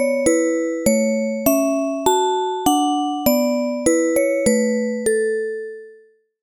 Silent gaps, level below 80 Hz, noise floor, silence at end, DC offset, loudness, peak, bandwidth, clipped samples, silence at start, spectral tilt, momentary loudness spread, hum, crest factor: none; -50 dBFS; -51 dBFS; 0.5 s; under 0.1%; -19 LUFS; -2 dBFS; 20 kHz; under 0.1%; 0 s; -3.5 dB/octave; 4 LU; none; 16 dB